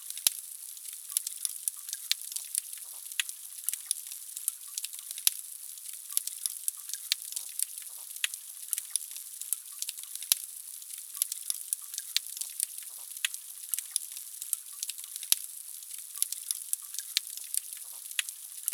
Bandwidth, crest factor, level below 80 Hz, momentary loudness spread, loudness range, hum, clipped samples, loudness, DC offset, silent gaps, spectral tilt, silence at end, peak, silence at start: over 20 kHz; 30 dB; -80 dBFS; 11 LU; 1 LU; none; under 0.1%; -33 LUFS; under 0.1%; none; 5 dB/octave; 0 s; -6 dBFS; 0 s